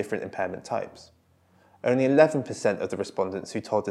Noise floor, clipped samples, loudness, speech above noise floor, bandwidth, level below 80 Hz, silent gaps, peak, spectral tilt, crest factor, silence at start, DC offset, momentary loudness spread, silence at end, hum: -62 dBFS; under 0.1%; -26 LUFS; 36 dB; 12.5 kHz; -72 dBFS; none; -4 dBFS; -6 dB/octave; 22 dB; 0 s; under 0.1%; 12 LU; 0 s; none